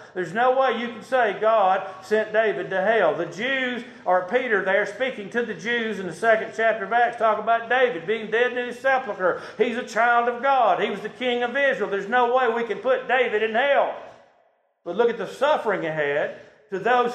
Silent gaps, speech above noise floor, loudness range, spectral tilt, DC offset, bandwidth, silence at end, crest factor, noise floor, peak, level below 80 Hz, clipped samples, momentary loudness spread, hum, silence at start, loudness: none; 41 dB; 2 LU; -4.5 dB/octave; under 0.1%; 9.8 kHz; 0 s; 16 dB; -63 dBFS; -6 dBFS; -74 dBFS; under 0.1%; 8 LU; none; 0 s; -22 LUFS